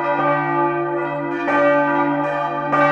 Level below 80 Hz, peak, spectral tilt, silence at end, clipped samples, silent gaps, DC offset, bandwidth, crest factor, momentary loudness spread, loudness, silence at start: -64 dBFS; -4 dBFS; -7.5 dB/octave; 0 s; under 0.1%; none; under 0.1%; 7.8 kHz; 16 dB; 6 LU; -19 LUFS; 0 s